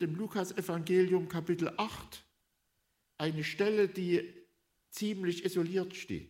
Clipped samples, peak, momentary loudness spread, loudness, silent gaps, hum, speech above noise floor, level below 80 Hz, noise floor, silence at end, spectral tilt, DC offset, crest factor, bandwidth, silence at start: under 0.1%; -18 dBFS; 11 LU; -33 LUFS; none; none; 46 dB; -68 dBFS; -79 dBFS; 0.05 s; -6 dB/octave; under 0.1%; 16 dB; 16 kHz; 0 s